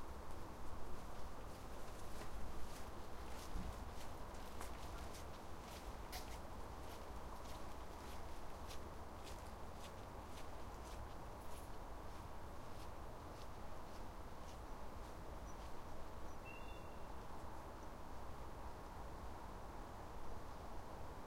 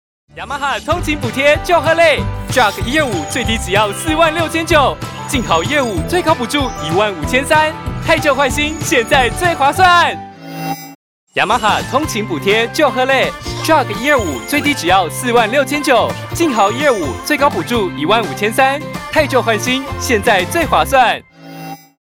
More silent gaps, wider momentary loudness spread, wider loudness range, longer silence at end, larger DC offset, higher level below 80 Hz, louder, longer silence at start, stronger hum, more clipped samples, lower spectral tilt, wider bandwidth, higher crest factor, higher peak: second, none vs 10.95-11.27 s; second, 3 LU vs 7 LU; about the same, 2 LU vs 2 LU; second, 0 s vs 0.25 s; neither; second, -54 dBFS vs -34 dBFS; second, -54 LUFS vs -14 LUFS; second, 0 s vs 0.35 s; neither; neither; about the same, -5 dB/octave vs -4 dB/octave; second, 16 kHz vs 20 kHz; about the same, 16 dB vs 12 dB; second, -32 dBFS vs -2 dBFS